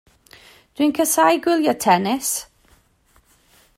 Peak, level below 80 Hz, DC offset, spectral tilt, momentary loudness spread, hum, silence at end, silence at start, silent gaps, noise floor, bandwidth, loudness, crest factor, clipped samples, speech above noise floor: -4 dBFS; -62 dBFS; under 0.1%; -3.5 dB/octave; 6 LU; none; 1.35 s; 0.8 s; none; -58 dBFS; 16 kHz; -18 LUFS; 18 dB; under 0.1%; 40 dB